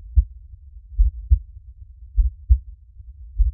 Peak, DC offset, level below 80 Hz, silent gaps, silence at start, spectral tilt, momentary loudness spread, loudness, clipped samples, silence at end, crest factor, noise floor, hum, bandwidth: -4 dBFS; under 0.1%; -22 dBFS; none; 0.1 s; -14 dB/octave; 23 LU; -24 LUFS; under 0.1%; 0 s; 18 dB; -42 dBFS; none; 0.2 kHz